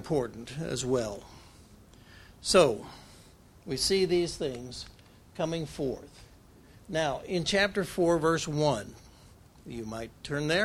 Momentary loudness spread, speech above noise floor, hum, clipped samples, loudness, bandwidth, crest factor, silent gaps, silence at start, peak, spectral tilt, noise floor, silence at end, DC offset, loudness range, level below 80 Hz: 18 LU; 26 dB; none; under 0.1%; -29 LUFS; 15.5 kHz; 24 dB; none; 0 s; -8 dBFS; -4.5 dB/octave; -55 dBFS; 0 s; under 0.1%; 4 LU; -54 dBFS